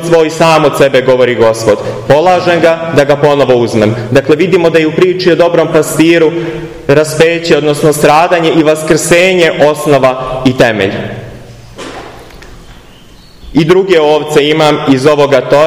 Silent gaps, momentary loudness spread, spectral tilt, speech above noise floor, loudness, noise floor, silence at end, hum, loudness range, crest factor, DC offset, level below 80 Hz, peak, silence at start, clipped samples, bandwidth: none; 7 LU; -5 dB/octave; 28 dB; -8 LUFS; -36 dBFS; 0 s; none; 6 LU; 8 dB; 0.5%; -38 dBFS; 0 dBFS; 0 s; 2%; 16 kHz